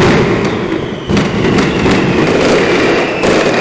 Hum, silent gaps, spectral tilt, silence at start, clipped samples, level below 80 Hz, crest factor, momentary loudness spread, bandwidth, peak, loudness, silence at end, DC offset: none; none; -5.5 dB/octave; 0 s; under 0.1%; -30 dBFS; 10 dB; 5 LU; 8 kHz; 0 dBFS; -11 LUFS; 0 s; under 0.1%